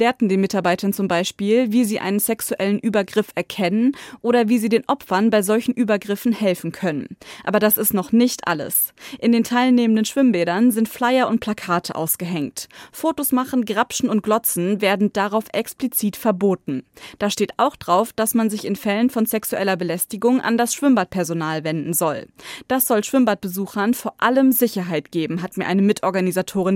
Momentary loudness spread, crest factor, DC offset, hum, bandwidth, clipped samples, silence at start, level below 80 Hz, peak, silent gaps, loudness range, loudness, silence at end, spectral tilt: 7 LU; 16 dB; under 0.1%; none; 17 kHz; under 0.1%; 0 s; -62 dBFS; -2 dBFS; none; 3 LU; -20 LUFS; 0 s; -4.5 dB/octave